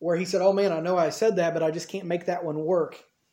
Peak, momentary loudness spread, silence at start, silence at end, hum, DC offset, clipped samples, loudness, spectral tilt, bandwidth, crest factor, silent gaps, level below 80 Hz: -8 dBFS; 7 LU; 0 s; 0.35 s; none; under 0.1%; under 0.1%; -25 LUFS; -5.5 dB/octave; 16.5 kHz; 16 dB; none; -76 dBFS